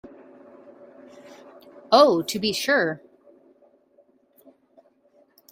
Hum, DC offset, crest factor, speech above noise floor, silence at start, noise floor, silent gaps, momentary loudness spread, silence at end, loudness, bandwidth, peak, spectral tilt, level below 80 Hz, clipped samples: none; under 0.1%; 24 dB; 41 dB; 1.9 s; -61 dBFS; none; 11 LU; 2.55 s; -20 LUFS; 16 kHz; -2 dBFS; -3.5 dB/octave; -70 dBFS; under 0.1%